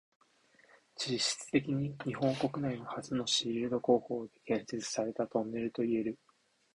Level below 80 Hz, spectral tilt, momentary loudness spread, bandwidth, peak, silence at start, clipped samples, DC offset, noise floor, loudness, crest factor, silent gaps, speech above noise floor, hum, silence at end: -70 dBFS; -4.5 dB/octave; 9 LU; 11.5 kHz; -14 dBFS; 1 s; under 0.1%; under 0.1%; -72 dBFS; -34 LUFS; 20 dB; none; 38 dB; none; 0.6 s